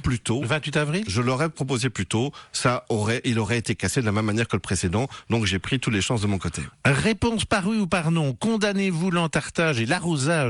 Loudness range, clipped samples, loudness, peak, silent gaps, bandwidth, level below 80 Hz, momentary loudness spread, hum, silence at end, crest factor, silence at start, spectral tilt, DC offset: 2 LU; under 0.1%; -24 LUFS; -8 dBFS; none; 12 kHz; -46 dBFS; 3 LU; none; 0 s; 16 dB; 0 s; -5 dB/octave; under 0.1%